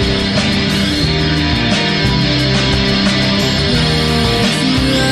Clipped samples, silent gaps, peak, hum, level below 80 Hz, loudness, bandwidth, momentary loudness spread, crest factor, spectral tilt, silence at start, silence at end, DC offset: under 0.1%; none; -2 dBFS; none; -26 dBFS; -13 LUFS; 13.5 kHz; 1 LU; 10 dB; -5 dB/octave; 0 s; 0 s; under 0.1%